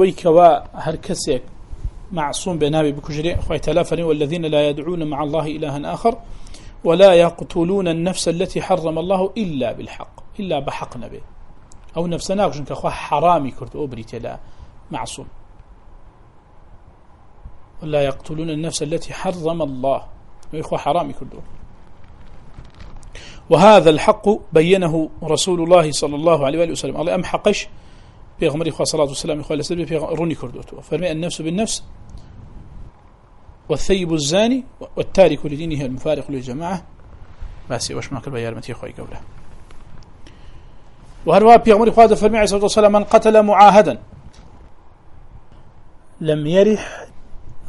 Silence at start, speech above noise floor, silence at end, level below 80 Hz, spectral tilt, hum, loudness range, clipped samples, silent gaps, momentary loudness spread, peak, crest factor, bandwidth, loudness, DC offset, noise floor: 0 s; 29 dB; 0 s; -38 dBFS; -5 dB/octave; none; 14 LU; under 0.1%; none; 19 LU; 0 dBFS; 18 dB; 11.5 kHz; -17 LUFS; under 0.1%; -46 dBFS